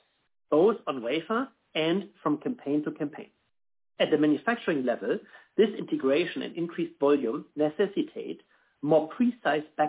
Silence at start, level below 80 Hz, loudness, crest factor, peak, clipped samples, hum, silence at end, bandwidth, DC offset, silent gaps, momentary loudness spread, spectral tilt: 0.5 s; -78 dBFS; -28 LUFS; 16 dB; -12 dBFS; under 0.1%; none; 0 s; 4 kHz; under 0.1%; none; 10 LU; -9.5 dB/octave